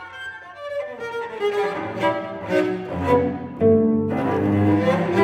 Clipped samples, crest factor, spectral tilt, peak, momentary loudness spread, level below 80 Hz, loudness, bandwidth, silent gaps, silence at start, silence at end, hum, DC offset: under 0.1%; 16 dB; -8 dB/octave; -6 dBFS; 12 LU; -52 dBFS; -22 LUFS; 11 kHz; none; 0 s; 0 s; none; under 0.1%